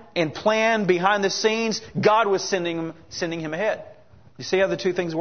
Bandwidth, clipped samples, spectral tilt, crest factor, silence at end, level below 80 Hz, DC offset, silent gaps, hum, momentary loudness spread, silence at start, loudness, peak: 6.6 kHz; under 0.1%; -4 dB/octave; 18 dB; 0 s; -62 dBFS; 0.2%; none; none; 10 LU; 0 s; -22 LUFS; -4 dBFS